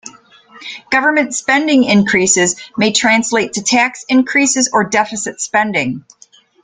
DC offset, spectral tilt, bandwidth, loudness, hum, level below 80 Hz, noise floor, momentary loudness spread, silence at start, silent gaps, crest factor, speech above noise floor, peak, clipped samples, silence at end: under 0.1%; -2.5 dB/octave; 9.8 kHz; -13 LUFS; none; -54 dBFS; -43 dBFS; 9 LU; 0.05 s; none; 14 dB; 29 dB; 0 dBFS; under 0.1%; 0.65 s